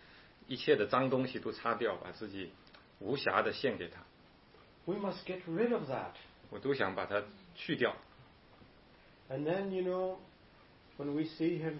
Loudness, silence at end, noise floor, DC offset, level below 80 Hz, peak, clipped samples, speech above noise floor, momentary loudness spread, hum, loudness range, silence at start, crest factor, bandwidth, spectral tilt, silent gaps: -36 LUFS; 0 s; -62 dBFS; under 0.1%; -70 dBFS; -12 dBFS; under 0.1%; 26 dB; 16 LU; none; 4 LU; 0 s; 24 dB; 5.8 kHz; -4 dB/octave; none